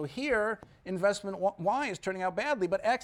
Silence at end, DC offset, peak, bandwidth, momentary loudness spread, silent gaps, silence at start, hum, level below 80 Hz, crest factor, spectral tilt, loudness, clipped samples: 0 s; under 0.1%; -16 dBFS; 12.5 kHz; 5 LU; none; 0 s; none; -62 dBFS; 16 dB; -5 dB/octave; -31 LUFS; under 0.1%